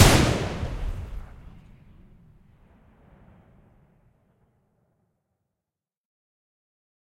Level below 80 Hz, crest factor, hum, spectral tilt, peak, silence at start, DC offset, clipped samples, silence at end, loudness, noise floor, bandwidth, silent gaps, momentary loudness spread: -38 dBFS; 28 dB; none; -4.5 dB/octave; 0 dBFS; 0 s; under 0.1%; under 0.1%; 5.85 s; -25 LUFS; -89 dBFS; 16 kHz; none; 29 LU